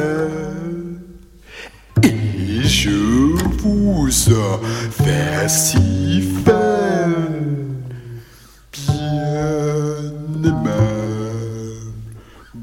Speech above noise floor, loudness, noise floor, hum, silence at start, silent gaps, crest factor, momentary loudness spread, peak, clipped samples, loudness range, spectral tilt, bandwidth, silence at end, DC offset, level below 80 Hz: 29 dB; -18 LUFS; -44 dBFS; none; 0 s; none; 18 dB; 18 LU; 0 dBFS; under 0.1%; 6 LU; -5 dB/octave; 17 kHz; 0 s; under 0.1%; -32 dBFS